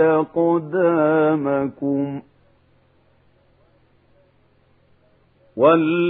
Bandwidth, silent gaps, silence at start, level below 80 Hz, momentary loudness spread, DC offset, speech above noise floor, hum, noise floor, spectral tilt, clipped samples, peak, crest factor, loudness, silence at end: 3.9 kHz; none; 0 s; -64 dBFS; 10 LU; under 0.1%; 40 dB; none; -58 dBFS; -11 dB/octave; under 0.1%; -4 dBFS; 18 dB; -19 LUFS; 0 s